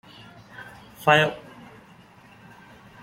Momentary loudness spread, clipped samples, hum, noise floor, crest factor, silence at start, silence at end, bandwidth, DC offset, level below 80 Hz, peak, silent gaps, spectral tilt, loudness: 28 LU; under 0.1%; none; -51 dBFS; 26 dB; 0.6 s; 1.65 s; 16.5 kHz; under 0.1%; -62 dBFS; -2 dBFS; none; -4.5 dB/octave; -21 LUFS